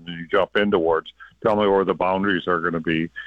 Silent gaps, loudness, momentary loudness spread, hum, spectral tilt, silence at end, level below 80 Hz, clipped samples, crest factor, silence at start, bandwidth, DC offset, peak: none; -21 LUFS; 5 LU; none; -8 dB/octave; 0 s; -52 dBFS; under 0.1%; 14 dB; 0.05 s; 5.8 kHz; under 0.1%; -8 dBFS